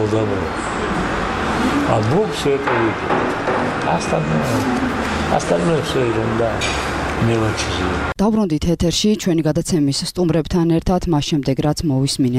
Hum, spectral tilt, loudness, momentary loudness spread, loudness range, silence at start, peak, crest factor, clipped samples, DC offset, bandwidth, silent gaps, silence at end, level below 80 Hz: none; -5.5 dB/octave; -18 LUFS; 3 LU; 1 LU; 0 s; -2 dBFS; 16 dB; under 0.1%; under 0.1%; 15.5 kHz; none; 0 s; -34 dBFS